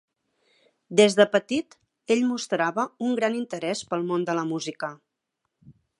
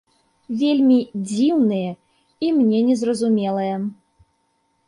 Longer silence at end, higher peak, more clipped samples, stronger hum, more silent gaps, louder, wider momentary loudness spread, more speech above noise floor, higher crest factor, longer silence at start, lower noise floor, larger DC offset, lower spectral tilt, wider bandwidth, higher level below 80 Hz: second, 0.3 s vs 0.95 s; about the same, -4 dBFS vs -6 dBFS; neither; neither; neither; second, -25 LUFS vs -20 LUFS; about the same, 11 LU vs 12 LU; first, 57 dB vs 49 dB; first, 22 dB vs 14 dB; first, 0.9 s vs 0.5 s; first, -81 dBFS vs -67 dBFS; neither; second, -4.5 dB/octave vs -6.5 dB/octave; about the same, 11.5 kHz vs 11 kHz; second, -74 dBFS vs -68 dBFS